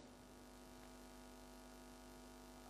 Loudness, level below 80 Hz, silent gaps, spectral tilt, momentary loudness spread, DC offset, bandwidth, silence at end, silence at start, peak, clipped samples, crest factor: -60 LUFS; -68 dBFS; none; -4 dB/octave; 1 LU; under 0.1%; 15.5 kHz; 0 s; 0 s; -46 dBFS; under 0.1%; 12 dB